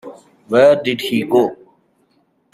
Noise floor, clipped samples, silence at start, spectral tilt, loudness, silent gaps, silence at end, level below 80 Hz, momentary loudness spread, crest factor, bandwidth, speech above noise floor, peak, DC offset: -61 dBFS; under 0.1%; 0.05 s; -5.5 dB/octave; -15 LUFS; none; 1 s; -62 dBFS; 8 LU; 16 dB; 14.5 kHz; 47 dB; -2 dBFS; under 0.1%